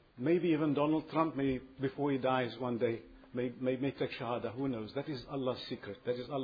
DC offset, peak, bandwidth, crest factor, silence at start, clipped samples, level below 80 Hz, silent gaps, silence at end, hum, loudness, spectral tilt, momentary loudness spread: under 0.1%; -16 dBFS; 5 kHz; 18 dB; 0.15 s; under 0.1%; -64 dBFS; none; 0 s; none; -35 LUFS; -5.5 dB/octave; 9 LU